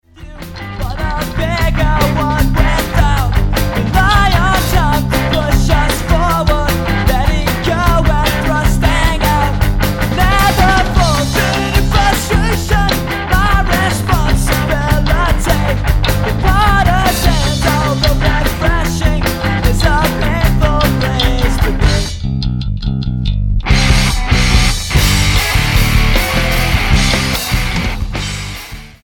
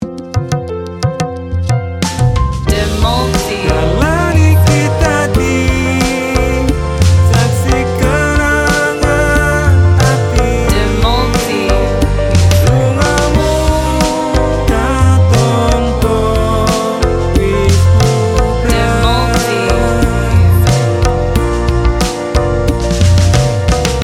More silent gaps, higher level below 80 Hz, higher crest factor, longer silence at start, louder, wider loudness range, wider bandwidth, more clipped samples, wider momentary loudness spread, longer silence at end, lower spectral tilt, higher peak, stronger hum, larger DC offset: neither; about the same, -16 dBFS vs -18 dBFS; about the same, 12 dB vs 10 dB; first, 0.15 s vs 0 s; about the same, -13 LUFS vs -12 LUFS; about the same, 2 LU vs 1 LU; first, 17.5 kHz vs 15.5 kHz; neither; about the same, 7 LU vs 5 LU; first, 0.15 s vs 0 s; about the same, -5 dB/octave vs -5.5 dB/octave; about the same, 0 dBFS vs 0 dBFS; neither; neither